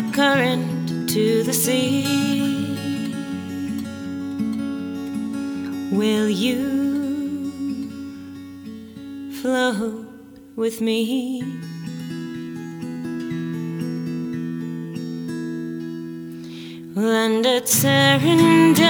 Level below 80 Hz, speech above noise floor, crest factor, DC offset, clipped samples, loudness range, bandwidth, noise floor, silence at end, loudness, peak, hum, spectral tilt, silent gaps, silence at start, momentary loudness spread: -62 dBFS; 24 dB; 20 dB; under 0.1%; under 0.1%; 8 LU; over 20 kHz; -42 dBFS; 0 s; -22 LUFS; -2 dBFS; none; -4.5 dB/octave; none; 0 s; 17 LU